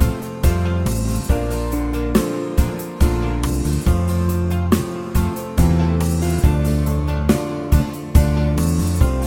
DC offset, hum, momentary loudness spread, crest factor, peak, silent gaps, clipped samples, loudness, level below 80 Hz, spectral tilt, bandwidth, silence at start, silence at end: under 0.1%; none; 4 LU; 18 dB; 0 dBFS; none; under 0.1%; -19 LUFS; -22 dBFS; -6.5 dB/octave; 17 kHz; 0 s; 0 s